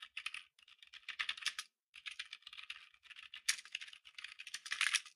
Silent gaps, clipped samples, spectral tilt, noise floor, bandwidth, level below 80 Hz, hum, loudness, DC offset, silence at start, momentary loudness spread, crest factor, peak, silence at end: 1.83-1.93 s; under 0.1%; 5.5 dB/octave; -65 dBFS; 15.5 kHz; -88 dBFS; none; -43 LUFS; under 0.1%; 0 s; 18 LU; 28 dB; -18 dBFS; 0.05 s